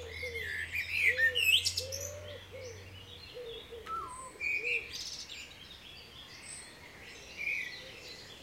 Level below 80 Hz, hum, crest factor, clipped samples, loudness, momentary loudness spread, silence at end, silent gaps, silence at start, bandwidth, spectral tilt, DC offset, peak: -62 dBFS; none; 22 dB; under 0.1%; -32 LUFS; 22 LU; 0 s; none; 0 s; 16 kHz; -0.5 dB/octave; under 0.1%; -14 dBFS